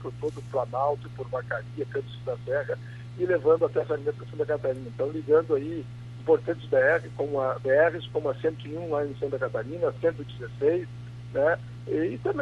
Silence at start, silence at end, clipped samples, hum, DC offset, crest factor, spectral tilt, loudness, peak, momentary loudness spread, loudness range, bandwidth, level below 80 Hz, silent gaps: 0 s; 0 s; under 0.1%; 60 Hz at -40 dBFS; under 0.1%; 18 dB; -8 dB/octave; -28 LUFS; -10 dBFS; 12 LU; 4 LU; 8.2 kHz; -56 dBFS; none